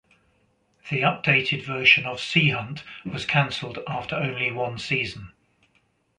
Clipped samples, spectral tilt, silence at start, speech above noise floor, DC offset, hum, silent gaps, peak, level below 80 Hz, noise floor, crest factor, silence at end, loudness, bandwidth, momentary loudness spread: under 0.1%; -5 dB/octave; 0.85 s; 42 dB; under 0.1%; none; none; -2 dBFS; -58 dBFS; -67 dBFS; 24 dB; 0.9 s; -22 LUFS; 10 kHz; 14 LU